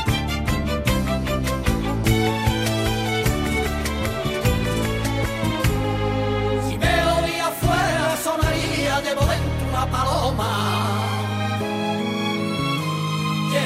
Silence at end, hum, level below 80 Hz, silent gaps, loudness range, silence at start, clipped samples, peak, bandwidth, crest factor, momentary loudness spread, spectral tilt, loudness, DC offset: 0 s; none; -30 dBFS; none; 2 LU; 0 s; under 0.1%; -6 dBFS; 16 kHz; 14 dB; 4 LU; -5 dB/octave; -22 LUFS; under 0.1%